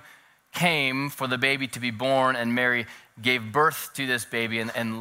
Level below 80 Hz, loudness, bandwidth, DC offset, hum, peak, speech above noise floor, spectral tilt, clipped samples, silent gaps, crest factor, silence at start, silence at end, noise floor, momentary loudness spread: -70 dBFS; -25 LUFS; 16 kHz; under 0.1%; none; -4 dBFS; 29 dB; -4 dB/octave; under 0.1%; none; 22 dB; 0.05 s; 0 s; -54 dBFS; 7 LU